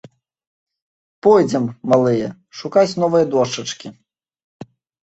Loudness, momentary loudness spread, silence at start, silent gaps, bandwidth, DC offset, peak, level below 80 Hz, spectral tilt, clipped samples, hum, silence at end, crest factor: -17 LUFS; 15 LU; 1.25 s; 4.44-4.60 s; 8.2 kHz; under 0.1%; -2 dBFS; -58 dBFS; -6 dB/octave; under 0.1%; none; 0.4 s; 18 dB